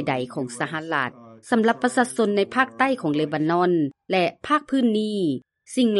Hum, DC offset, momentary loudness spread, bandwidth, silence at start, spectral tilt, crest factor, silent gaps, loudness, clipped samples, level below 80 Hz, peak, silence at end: none; under 0.1%; 7 LU; 11.5 kHz; 0 s; -5.5 dB/octave; 18 dB; none; -23 LUFS; under 0.1%; -68 dBFS; -4 dBFS; 0 s